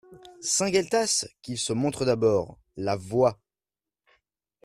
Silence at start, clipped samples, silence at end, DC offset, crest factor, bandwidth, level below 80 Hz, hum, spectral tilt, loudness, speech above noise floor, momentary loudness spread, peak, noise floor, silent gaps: 0.1 s; under 0.1%; 1.3 s; under 0.1%; 18 dB; 14 kHz; -60 dBFS; none; -3.5 dB/octave; -26 LUFS; over 65 dB; 10 LU; -10 dBFS; under -90 dBFS; none